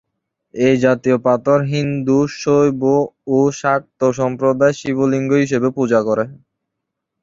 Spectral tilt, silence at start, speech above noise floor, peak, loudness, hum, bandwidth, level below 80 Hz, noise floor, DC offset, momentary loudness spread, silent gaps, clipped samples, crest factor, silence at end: -7 dB/octave; 0.55 s; 63 dB; -2 dBFS; -16 LUFS; none; 7.8 kHz; -56 dBFS; -78 dBFS; under 0.1%; 4 LU; none; under 0.1%; 14 dB; 0.85 s